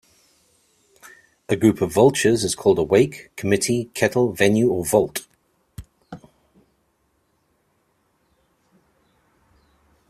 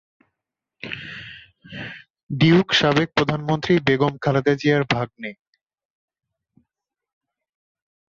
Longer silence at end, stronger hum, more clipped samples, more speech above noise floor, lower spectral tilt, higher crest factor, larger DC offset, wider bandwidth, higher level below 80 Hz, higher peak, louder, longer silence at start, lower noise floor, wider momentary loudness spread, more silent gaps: first, 3.95 s vs 2.75 s; neither; neither; second, 49 dB vs 65 dB; about the same, -5 dB/octave vs -6 dB/octave; about the same, 20 dB vs 20 dB; neither; first, 14.5 kHz vs 7.4 kHz; about the same, -54 dBFS vs -54 dBFS; about the same, -2 dBFS vs -4 dBFS; about the same, -19 LUFS vs -19 LUFS; first, 1.5 s vs 0.85 s; second, -67 dBFS vs -84 dBFS; second, 15 LU vs 20 LU; second, none vs 2.10-2.14 s, 2.23-2.27 s